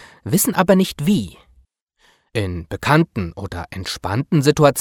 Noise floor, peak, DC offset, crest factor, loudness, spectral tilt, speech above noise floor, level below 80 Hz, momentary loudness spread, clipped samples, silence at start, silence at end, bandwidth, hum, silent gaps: -59 dBFS; 0 dBFS; under 0.1%; 20 dB; -19 LUFS; -5.5 dB/octave; 41 dB; -44 dBFS; 13 LU; under 0.1%; 0 s; 0 s; 18 kHz; none; 1.82-1.87 s